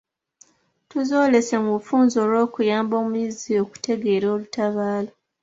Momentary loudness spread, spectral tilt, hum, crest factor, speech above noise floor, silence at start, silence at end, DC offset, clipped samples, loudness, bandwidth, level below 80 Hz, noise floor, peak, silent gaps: 8 LU; -5.5 dB/octave; none; 16 dB; 37 dB; 0.95 s; 0.35 s; under 0.1%; under 0.1%; -22 LUFS; 8 kHz; -66 dBFS; -57 dBFS; -4 dBFS; none